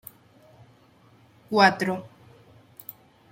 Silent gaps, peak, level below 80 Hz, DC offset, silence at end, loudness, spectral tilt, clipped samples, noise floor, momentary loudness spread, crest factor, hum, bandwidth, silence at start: none; -2 dBFS; -70 dBFS; under 0.1%; 1.25 s; -22 LUFS; -5 dB/octave; under 0.1%; -57 dBFS; 24 LU; 26 dB; none; 16.5 kHz; 1.5 s